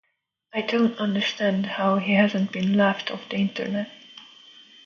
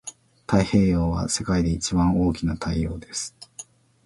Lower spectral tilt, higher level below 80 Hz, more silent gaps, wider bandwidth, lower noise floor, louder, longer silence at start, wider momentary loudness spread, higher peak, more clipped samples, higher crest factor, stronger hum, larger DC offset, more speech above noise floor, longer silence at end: about the same, -6.5 dB/octave vs -5.5 dB/octave; second, -68 dBFS vs -36 dBFS; neither; second, 7 kHz vs 11.5 kHz; first, -74 dBFS vs -45 dBFS; about the same, -24 LUFS vs -23 LUFS; first, 0.55 s vs 0.05 s; second, 12 LU vs 20 LU; about the same, -6 dBFS vs -4 dBFS; neither; about the same, 18 dB vs 20 dB; neither; neither; first, 51 dB vs 23 dB; first, 0.6 s vs 0.45 s